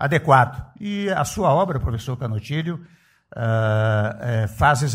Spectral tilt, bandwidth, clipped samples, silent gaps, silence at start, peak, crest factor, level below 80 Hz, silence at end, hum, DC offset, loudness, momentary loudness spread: -6 dB/octave; 15.5 kHz; under 0.1%; none; 0 s; -2 dBFS; 20 dB; -40 dBFS; 0 s; none; under 0.1%; -21 LUFS; 12 LU